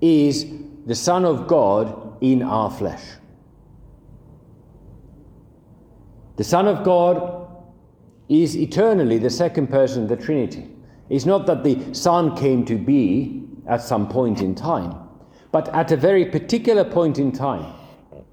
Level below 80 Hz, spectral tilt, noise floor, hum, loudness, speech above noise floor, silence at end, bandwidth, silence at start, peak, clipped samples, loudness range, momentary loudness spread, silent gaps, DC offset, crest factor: -52 dBFS; -6.5 dB/octave; -50 dBFS; none; -20 LUFS; 32 dB; 0.1 s; 16.5 kHz; 0 s; -2 dBFS; under 0.1%; 6 LU; 13 LU; none; under 0.1%; 18 dB